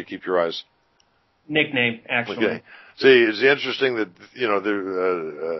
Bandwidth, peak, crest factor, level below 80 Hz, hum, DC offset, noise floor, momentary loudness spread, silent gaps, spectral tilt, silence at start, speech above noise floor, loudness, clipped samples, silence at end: 6 kHz; -2 dBFS; 20 dB; -68 dBFS; none; under 0.1%; -64 dBFS; 12 LU; none; -6 dB/octave; 0 s; 42 dB; -21 LUFS; under 0.1%; 0 s